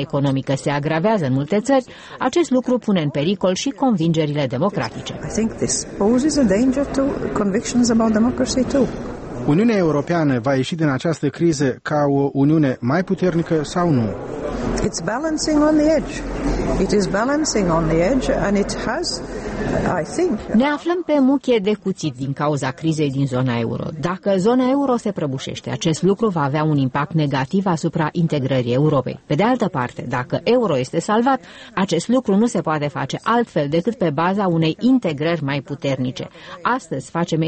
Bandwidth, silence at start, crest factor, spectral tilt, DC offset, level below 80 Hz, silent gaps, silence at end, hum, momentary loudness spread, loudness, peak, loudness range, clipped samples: 8.8 kHz; 0 s; 14 dB; -6 dB/octave; under 0.1%; -40 dBFS; none; 0 s; none; 8 LU; -19 LUFS; -6 dBFS; 2 LU; under 0.1%